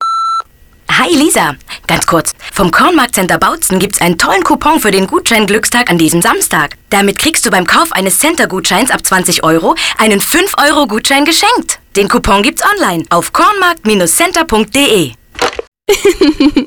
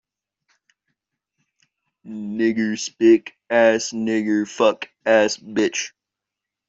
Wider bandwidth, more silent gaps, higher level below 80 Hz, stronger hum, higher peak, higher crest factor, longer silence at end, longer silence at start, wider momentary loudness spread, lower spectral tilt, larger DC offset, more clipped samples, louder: first, over 20 kHz vs 7.8 kHz; first, 15.68-15.72 s vs none; first, -34 dBFS vs -68 dBFS; neither; first, 0 dBFS vs -4 dBFS; second, 10 dB vs 18 dB; second, 0 s vs 0.8 s; second, 0 s vs 2.05 s; second, 5 LU vs 11 LU; about the same, -3 dB/octave vs -4 dB/octave; neither; neither; first, -9 LUFS vs -20 LUFS